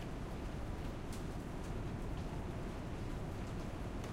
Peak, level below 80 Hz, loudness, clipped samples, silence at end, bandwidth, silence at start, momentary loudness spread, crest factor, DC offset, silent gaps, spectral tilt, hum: -30 dBFS; -46 dBFS; -45 LUFS; under 0.1%; 0 s; 16 kHz; 0 s; 1 LU; 12 dB; under 0.1%; none; -6.5 dB/octave; none